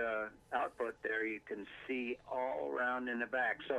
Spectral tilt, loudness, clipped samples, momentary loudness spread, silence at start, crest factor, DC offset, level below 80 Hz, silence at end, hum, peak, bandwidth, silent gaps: -5 dB/octave; -39 LUFS; under 0.1%; 6 LU; 0 s; 16 dB; under 0.1%; -72 dBFS; 0 s; none; -22 dBFS; 12.5 kHz; none